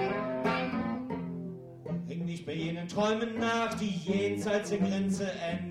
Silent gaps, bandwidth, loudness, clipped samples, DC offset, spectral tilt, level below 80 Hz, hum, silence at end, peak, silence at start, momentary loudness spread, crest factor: none; 12.5 kHz; -32 LUFS; under 0.1%; under 0.1%; -6 dB/octave; -62 dBFS; none; 0 s; -16 dBFS; 0 s; 8 LU; 16 dB